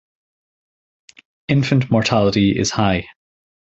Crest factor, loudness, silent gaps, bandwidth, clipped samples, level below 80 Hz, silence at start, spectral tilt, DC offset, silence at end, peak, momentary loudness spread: 18 dB; -17 LUFS; none; 8.2 kHz; under 0.1%; -44 dBFS; 1.5 s; -5.5 dB/octave; under 0.1%; 0.55 s; 0 dBFS; 6 LU